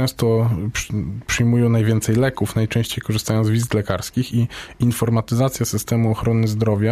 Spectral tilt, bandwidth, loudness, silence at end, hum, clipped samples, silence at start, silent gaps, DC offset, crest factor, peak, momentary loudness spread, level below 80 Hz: -6 dB/octave; 15.5 kHz; -20 LUFS; 0 s; none; under 0.1%; 0 s; none; under 0.1%; 14 dB; -6 dBFS; 6 LU; -42 dBFS